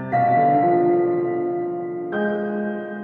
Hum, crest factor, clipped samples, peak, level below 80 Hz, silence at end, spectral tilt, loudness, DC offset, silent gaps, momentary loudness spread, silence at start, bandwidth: none; 14 dB; under 0.1%; -8 dBFS; -66 dBFS; 0 s; -10.5 dB/octave; -21 LUFS; under 0.1%; none; 10 LU; 0 s; 4.3 kHz